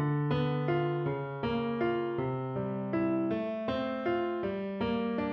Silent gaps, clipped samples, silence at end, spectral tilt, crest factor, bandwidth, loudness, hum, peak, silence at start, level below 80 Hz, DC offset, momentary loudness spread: none; under 0.1%; 0 s; -9.5 dB/octave; 14 dB; 5.8 kHz; -32 LUFS; none; -18 dBFS; 0 s; -58 dBFS; under 0.1%; 4 LU